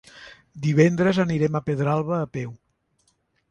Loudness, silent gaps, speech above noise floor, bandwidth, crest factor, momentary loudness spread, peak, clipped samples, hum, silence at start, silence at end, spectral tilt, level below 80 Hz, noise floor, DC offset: -22 LUFS; none; 47 dB; 9 kHz; 20 dB; 14 LU; -4 dBFS; under 0.1%; none; 0.15 s; 0.95 s; -7.5 dB/octave; -58 dBFS; -68 dBFS; under 0.1%